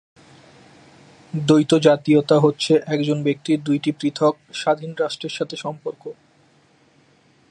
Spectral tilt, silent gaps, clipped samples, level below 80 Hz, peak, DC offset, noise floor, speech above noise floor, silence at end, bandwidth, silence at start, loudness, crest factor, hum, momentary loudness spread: -6 dB/octave; none; under 0.1%; -68 dBFS; -2 dBFS; under 0.1%; -57 dBFS; 38 dB; 1.4 s; 11.5 kHz; 1.35 s; -20 LUFS; 20 dB; none; 14 LU